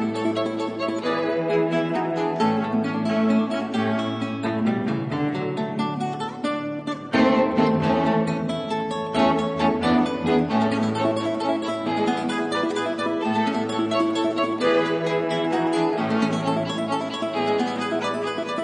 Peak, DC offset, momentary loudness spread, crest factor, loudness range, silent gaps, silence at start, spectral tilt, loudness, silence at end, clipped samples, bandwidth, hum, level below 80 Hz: -6 dBFS; under 0.1%; 6 LU; 16 dB; 2 LU; none; 0 s; -6 dB/octave; -23 LUFS; 0 s; under 0.1%; 10 kHz; none; -60 dBFS